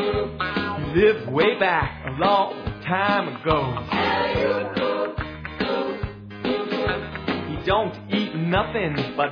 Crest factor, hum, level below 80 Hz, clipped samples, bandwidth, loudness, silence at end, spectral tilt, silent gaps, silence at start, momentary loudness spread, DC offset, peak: 18 dB; none; -42 dBFS; under 0.1%; 5.4 kHz; -23 LUFS; 0 s; -7.5 dB/octave; none; 0 s; 9 LU; under 0.1%; -4 dBFS